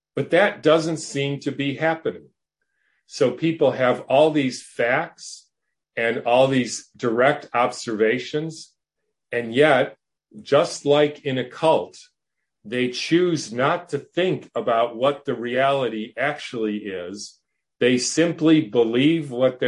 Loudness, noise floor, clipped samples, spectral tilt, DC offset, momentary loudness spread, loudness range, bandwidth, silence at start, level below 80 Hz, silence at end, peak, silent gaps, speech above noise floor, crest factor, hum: -21 LUFS; -82 dBFS; under 0.1%; -5 dB/octave; under 0.1%; 12 LU; 3 LU; 11.5 kHz; 0.15 s; -68 dBFS; 0 s; -2 dBFS; none; 61 dB; 20 dB; none